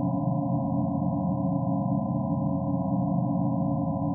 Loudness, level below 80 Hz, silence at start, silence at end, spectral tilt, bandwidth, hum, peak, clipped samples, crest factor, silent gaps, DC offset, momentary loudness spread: -27 LUFS; -54 dBFS; 0 s; 0 s; -6 dB/octave; 1.2 kHz; none; -14 dBFS; under 0.1%; 12 dB; none; under 0.1%; 1 LU